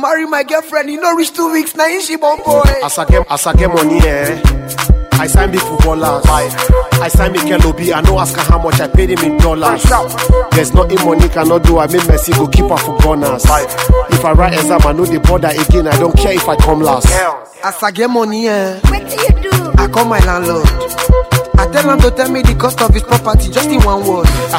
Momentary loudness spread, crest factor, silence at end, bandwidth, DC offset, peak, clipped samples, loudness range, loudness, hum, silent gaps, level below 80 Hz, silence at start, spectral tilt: 4 LU; 10 dB; 0 s; 16.5 kHz; 0.2%; 0 dBFS; 1%; 2 LU; -11 LUFS; none; none; -14 dBFS; 0 s; -5 dB/octave